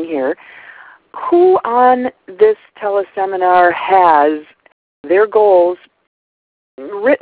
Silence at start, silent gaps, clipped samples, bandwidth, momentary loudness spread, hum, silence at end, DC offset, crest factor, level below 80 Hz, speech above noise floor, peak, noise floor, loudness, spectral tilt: 0 s; 4.72-5.04 s, 6.07-6.78 s; under 0.1%; 4 kHz; 15 LU; none; 0.05 s; under 0.1%; 14 dB; -60 dBFS; over 78 dB; 0 dBFS; under -90 dBFS; -13 LUFS; -8.5 dB/octave